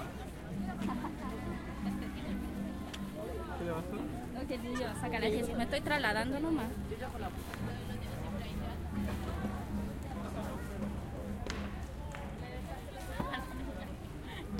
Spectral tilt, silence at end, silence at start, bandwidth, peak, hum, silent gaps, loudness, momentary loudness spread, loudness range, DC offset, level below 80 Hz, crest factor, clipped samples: -6 dB/octave; 0 s; 0 s; 16.5 kHz; -18 dBFS; none; none; -39 LUFS; 10 LU; 6 LU; under 0.1%; -46 dBFS; 20 dB; under 0.1%